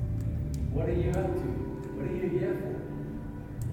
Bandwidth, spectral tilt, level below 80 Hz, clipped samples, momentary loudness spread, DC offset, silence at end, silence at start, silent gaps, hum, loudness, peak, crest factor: 16 kHz; -9 dB/octave; -40 dBFS; under 0.1%; 9 LU; under 0.1%; 0 s; 0 s; none; none; -33 LUFS; -18 dBFS; 14 dB